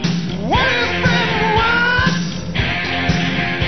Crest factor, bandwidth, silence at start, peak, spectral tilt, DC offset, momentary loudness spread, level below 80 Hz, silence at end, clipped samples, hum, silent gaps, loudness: 16 dB; 6.4 kHz; 0 s; -2 dBFS; -5 dB/octave; 2%; 6 LU; -32 dBFS; 0 s; under 0.1%; none; none; -16 LUFS